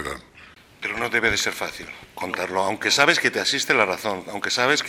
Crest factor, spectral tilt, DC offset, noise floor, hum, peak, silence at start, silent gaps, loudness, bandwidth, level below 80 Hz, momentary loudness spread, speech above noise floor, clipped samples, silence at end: 24 dB; -2 dB/octave; under 0.1%; -49 dBFS; none; 0 dBFS; 0 s; none; -21 LUFS; 16.5 kHz; -54 dBFS; 15 LU; 26 dB; under 0.1%; 0 s